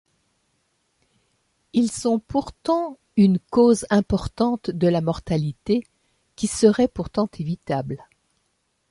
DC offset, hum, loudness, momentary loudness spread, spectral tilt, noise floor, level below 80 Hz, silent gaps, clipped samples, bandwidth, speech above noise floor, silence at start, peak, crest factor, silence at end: under 0.1%; none; -22 LUFS; 9 LU; -6.5 dB/octave; -71 dBFS; -48 dBFS; none; under 0.1%; 11.5 kHz; 50 dB; 1.75 s; -4 dBFS; 20 dB; 0.95 s